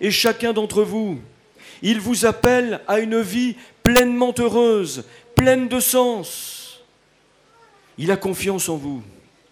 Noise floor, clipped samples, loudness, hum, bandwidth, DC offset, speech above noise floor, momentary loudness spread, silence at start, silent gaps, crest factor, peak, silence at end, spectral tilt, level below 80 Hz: -58 dBFS; under 0.1%; -19 LUFS; none; 15.5 kHz; under 0.1%; 38 dB; 13 LU; 0 s; none; 18 dB; -2 dBFS; 0.4 s; -4 dB/octave; -46 dBFS